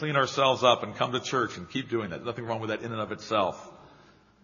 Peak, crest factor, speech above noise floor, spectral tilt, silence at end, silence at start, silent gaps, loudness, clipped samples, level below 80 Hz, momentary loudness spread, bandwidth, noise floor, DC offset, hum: -6 dBFS; 24 dB; 29 dB; -3 dB/octave; 0.55 s; 0 s; none; -28 LUFS; under 0.1%; -66 dBFS; 11 LU; 7.2 kHz; -57 dBFS; under 0.1%; none